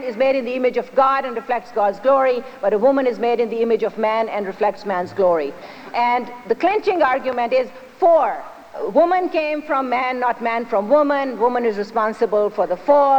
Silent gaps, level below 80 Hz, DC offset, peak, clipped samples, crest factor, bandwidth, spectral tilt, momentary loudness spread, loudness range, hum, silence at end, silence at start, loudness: none; -60 dBFS; under 0.1%; -4 dBFS; under 0.1%; 14 dB; 8.8 kHz; -6 dB/octave; 7 LU; 2 LU; none; 0 s; 0 s; -19 LUFS